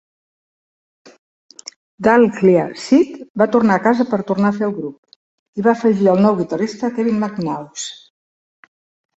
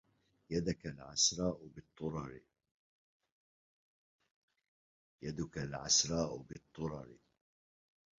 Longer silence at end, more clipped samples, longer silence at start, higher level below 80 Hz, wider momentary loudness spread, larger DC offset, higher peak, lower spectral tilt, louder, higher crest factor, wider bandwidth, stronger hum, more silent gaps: first, 1.2 s vs 1.05 s; neither; first, 2 s vs 0.5 s; about the same, -60 dBFS vs -62 dBFS; second, 16 LU vs 20 LU; neither; first, -2 dBFS vs -16 dBFS; first, -6.5 dB/octave vs -4 dB/octave; first, -16 LUFS vs -36 LUFS; second, 16 dB vs 26 dB; first, 8.2 kHz vs 7.4 kHz; neither; second, 3.30-3.35 s, 4.98-5.03 s, 5.16-5.53 s vs 2.71-3.20 s, 3.32-4.19 s, 4.31-4.48 s, 4.68-5.18 s